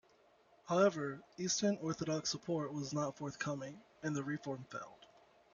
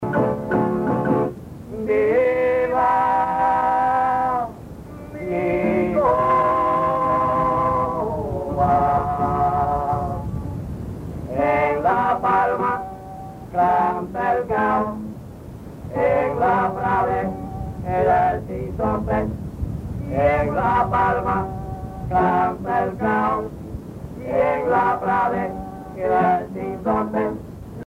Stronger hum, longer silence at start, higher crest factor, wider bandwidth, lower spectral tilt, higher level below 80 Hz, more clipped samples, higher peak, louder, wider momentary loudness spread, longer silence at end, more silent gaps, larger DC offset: neither; first, 0.65 s vs 0 s; first, 20 dB vs 14 dB; second, 7.4 kHz vs 15.5 kHz; second, -4.5 dB/octave vs -8.5 dB/octave; second, -76 dBFS vs -40 dBFS; neither; second, -20 dBFS vs -6 dBFS; second, -38 LUFS vs -21 LUFS; about the same, 13 LU vs 14 LU; first, 0.5 s vs 0 s; neither; neither